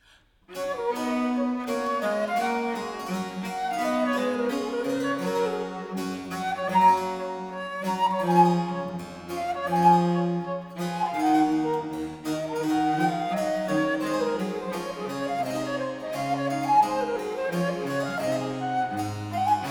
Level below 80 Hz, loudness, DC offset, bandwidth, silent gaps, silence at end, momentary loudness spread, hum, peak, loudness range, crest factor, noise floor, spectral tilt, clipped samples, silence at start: -62 dBFS; -26 LUFS; under 0.1%; 19.5 kHz; none; 0 s; 11 LU; none; -6 dBFS; 3 LU; 20 dB; -58 dBFS; -6 dB/octave; under 0.1%; 0.5 s